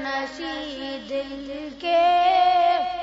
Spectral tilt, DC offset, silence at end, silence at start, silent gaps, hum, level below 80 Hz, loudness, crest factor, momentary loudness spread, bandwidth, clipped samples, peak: -3.5 dB/octave; under 0.1%; 0 s; 0 s; none; none; -56 dBFS; -22 LUFS; 12 dB; 15 LU; 7.8 kHz; under 0.1%; -10 dBFS